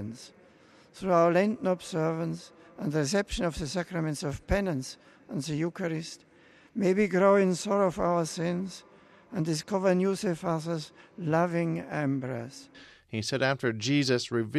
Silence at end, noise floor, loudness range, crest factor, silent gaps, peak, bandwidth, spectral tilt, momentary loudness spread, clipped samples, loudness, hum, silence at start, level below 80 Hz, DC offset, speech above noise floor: 0 s; -58 dBFS; 4 LU; 18 dB; none; -10 dBFS; 13 kHz; -5.5 dB/octave; 15 LU; under 0.1%; -29 LUFS; none; 0 s; -50 dBFS; under 0.1%; 29 dB